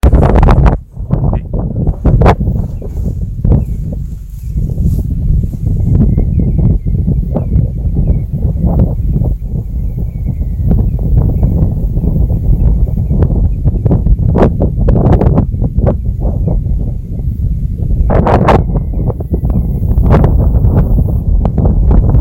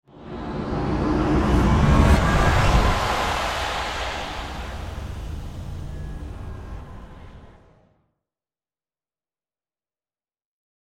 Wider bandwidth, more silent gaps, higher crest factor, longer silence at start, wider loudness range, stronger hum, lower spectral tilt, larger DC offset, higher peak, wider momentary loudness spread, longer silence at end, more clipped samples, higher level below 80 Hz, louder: second, 4.9 kHz vs 15 kHz; neither; second, 10 dB vs 20 dB; about the same, 0.05 s vs 0.15 s; second, 3 LU vs 20 LU; neither; first, -10 dB/octave vs -6 dB/octave; neither; first, 0 dBFS vs -4 dBFS; second, 9 LU vs 19 LU; second, 0 s vs 3.45 s; first, 0.4% vs under 0.1%; first, -14 dBFS vs -28 dBFS; first, -13 LUFS vs -22 LUFS